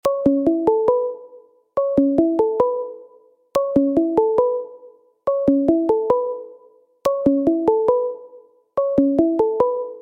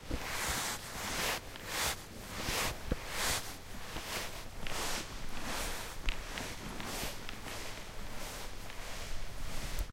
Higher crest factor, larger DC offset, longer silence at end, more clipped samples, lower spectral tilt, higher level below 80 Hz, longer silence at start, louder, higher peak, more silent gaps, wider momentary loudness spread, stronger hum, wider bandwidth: second, 16 dB vs 22 dB; neither; about the same, 0 s vs 0 s; neither; first, -8 dB/octave vs -2 dB/octave; second, -52 dBFS vs -44 dBFS; about the same, 0.05 s vs 0 s; first, -19 LUFS vs -39 LUFS; first, -4 dBFS vs -16 dBFS; neither; about the same, 10 LU vs 10 LU; neither; about the same, 16 kHz vs 16 kHz